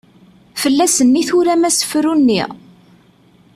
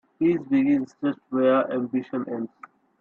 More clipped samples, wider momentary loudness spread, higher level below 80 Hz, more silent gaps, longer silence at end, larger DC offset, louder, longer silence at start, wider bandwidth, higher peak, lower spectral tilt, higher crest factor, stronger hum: neither; about the same, 8 LU vs 10 LU; first, -56 dBFS vs -70 dBFS; neither; first, 1 s vs 0.55 s; neither; first, -14 LUFS vs -24 LUFS; first, 0.55 s vs 0.2 s; first, 14.5 kHz vs 6.4 kHz; first, -2 dBFS vs -10 dBFS; second, -3 dB/octave vs -8.5 dB/octave; about the same, 14 dB vs 14 dB; neither